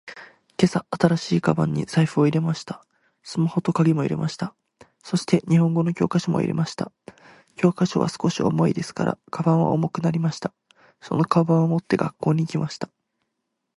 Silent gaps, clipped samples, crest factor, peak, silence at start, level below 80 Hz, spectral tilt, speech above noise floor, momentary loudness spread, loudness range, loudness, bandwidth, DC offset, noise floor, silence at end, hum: none; under 0.1%; 20 dB; -2 dBFS; 0.05 s; -58 dBFS; -7 dB/octave; 57 dB; 13 LU; 2 LU; -23 LUFS; 11.5 kHz; under 0.1%; -78 dBFS; 0.9 s; none